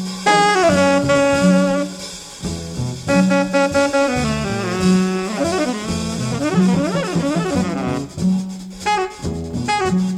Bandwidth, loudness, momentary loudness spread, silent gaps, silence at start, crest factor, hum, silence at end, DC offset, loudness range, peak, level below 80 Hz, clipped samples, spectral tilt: 13.5 kHz; -18 LUFS; 11 LU; none; 0 s; 16 dB; none; 0 s; under 0.1%; 3 LU; -2 dBFS; -42 dBFS; under 0.1%; -5.5 dB/octave